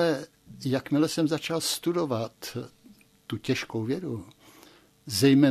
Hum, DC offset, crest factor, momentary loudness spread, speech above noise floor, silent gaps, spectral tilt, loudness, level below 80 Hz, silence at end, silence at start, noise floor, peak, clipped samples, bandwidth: none; under 0.1%; 18 dB; 15 LU; 30 dB; none; -5 dB/octave; -28 LUFS; -66 dBFS; 0 s; 0 s; -56 dBFS; -10 dBFS; under 0.1%; 14 kHz